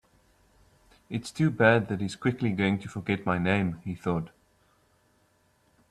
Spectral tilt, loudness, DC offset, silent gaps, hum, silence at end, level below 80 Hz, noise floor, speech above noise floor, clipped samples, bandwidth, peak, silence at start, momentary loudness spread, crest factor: -7 dB/octave; -28 LUFS; under 0.1%; none; none; 1.65 s; -60 dBFS; -67 dBFS; 40 dB; under 0.1%; 12.5 kHz; -6 dBFS; 1.1 s; 13 LU; 24 dB